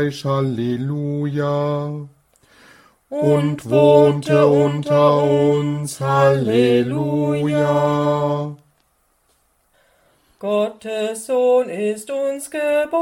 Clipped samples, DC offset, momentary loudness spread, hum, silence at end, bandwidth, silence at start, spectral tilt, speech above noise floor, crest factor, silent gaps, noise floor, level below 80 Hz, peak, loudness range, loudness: under 0.1%; under 0.1%; 9 LU; none; 0 s; 15.5 kHz; 0 s; -7 dB/octave; 46 dB; 18 dB; none; -63 dBFS; -58 dBFS; -2 dBFS; 8 LU; -18 LUFS